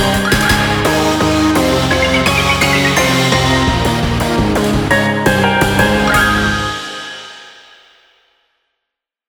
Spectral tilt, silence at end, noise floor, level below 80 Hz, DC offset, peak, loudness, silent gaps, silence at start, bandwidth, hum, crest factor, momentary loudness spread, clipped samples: -4.5 dB/octave; 1.8 s; -79 dBFS; -28 dBFS; under 0.1%; 0 dBFS; -12 LUFS; none; 0 s; over 20 kHz; none; 14 dB; 6 LU; under 0.1%